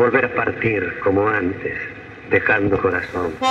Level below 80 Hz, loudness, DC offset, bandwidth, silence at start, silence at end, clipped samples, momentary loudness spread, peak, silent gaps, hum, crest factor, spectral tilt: -48 dBFS; -19 LUFS; under 0.1%; 8.2 kHz; 0 s; 0 s; under 0.1%; 10 LU; -2 dBFS; none; none; 18 dB; -6.5 dB/octave